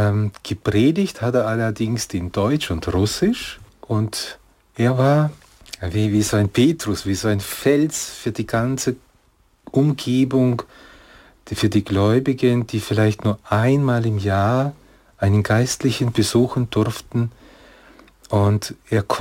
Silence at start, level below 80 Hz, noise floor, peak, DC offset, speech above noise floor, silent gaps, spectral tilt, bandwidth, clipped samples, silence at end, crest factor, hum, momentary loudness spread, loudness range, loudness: 0 s; -46 dBFS; -58 dBFS; -4 dBFS; under 0.1%; 39 dB; none; -6 dB/octave; 16.5 kHz; under 0.1%; 0 s; 16 dB; none; 8 LU; 3 LU; -20 LUFS